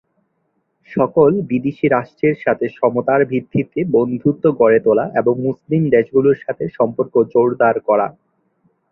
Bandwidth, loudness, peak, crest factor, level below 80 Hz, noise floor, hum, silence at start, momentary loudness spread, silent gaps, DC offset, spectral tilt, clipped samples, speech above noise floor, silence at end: 4.1 kHz; -16 LUFS; -2 dBFS; 14 dB; -56 dBFS; -67 dBFS; none; 0.9 s; 6 LU; none; under 0.1%; -11 dB/octave; under 0.1%; 52 dB; 0.8 s